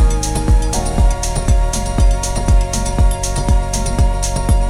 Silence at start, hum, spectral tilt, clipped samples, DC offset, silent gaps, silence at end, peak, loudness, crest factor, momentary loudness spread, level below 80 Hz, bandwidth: 0 s; none; -5 dB/octave; under 0.1%; under 0.1%; none; 0 s; -2 dBFS; -17 LUFS; 12 dB; 3 LU; -14 dBFS; 13.5 kHz